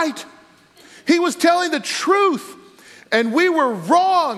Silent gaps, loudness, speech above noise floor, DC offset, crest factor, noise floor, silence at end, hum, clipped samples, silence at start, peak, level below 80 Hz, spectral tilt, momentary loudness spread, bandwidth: none; -17 LUFS; 32 dB; under 0.1%; 16 dB; -49 dBFS; 0 s; none; under 0.1%; 0 s; -4 dBFS; -78 dBFS; -3.5 dB/octave; 12 LU; 14 kHz